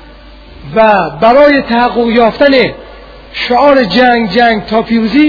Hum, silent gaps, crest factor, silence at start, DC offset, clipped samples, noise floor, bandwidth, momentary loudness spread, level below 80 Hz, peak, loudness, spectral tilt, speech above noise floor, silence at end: none; none; 8 dB; 0.55 s; under 0.1%; 1%; -33 dBFS; 5.4 kHz; 8 LU; -36 dBFS; 0 dBFS; -8 LUFS; -7 dB/octave; 26 dB; 0 s